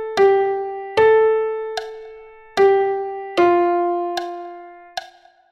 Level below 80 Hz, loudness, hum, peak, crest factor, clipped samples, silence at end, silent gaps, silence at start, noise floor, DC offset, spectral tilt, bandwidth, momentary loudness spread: -58 dBFS; -18 LUFS; none; -4 dBFS; 14 dB; under 0.1%; 0.45 s; none; 0 s; -46 dBFS; under 0.1%; -5 dB/octave; 10.5 kHz; 18 LU